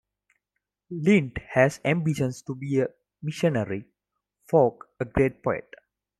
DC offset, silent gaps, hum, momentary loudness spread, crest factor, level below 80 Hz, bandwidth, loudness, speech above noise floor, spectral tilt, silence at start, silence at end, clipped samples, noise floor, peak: under 0.1%; none; 50 Hz at -55 dBFS; 13 LU; 20 dB; -52 dBFS; 13 kHz; -25 LUFS; 59 dB; -7 dB/octave; 0.9 s; 0.6 s; under 0.1%; -83 dBFS; -6 dBFS